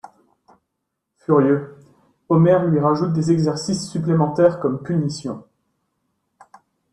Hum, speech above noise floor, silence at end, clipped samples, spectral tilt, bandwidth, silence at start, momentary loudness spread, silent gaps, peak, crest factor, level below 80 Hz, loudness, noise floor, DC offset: none; 60 dB; 1.5 s; under 0.1%; -7.5 dB/octave; 10.5 kHz; 0.05 s; 14 LU; none; -2 dBFS; 18 dB; -58 dBFS; -19 LUFS; -78 dBFS; under 0.1%